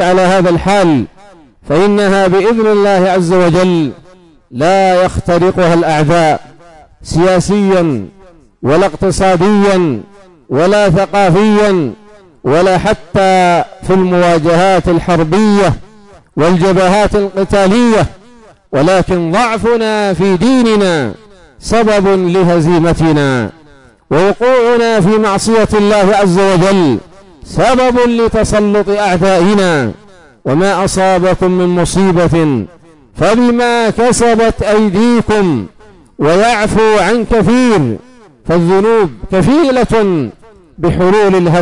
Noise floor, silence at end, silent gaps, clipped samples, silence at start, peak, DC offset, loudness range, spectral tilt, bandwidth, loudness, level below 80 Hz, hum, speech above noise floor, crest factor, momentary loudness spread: -41 dBFS; 0 s; none; under 0.1%; 0 s; -2 dBFS; 2%; 2 LU; -6 dB/octave; 11 kHz; -10 LUFS; -32 dBFS; none; 32 dB; 8 dB; 7 LU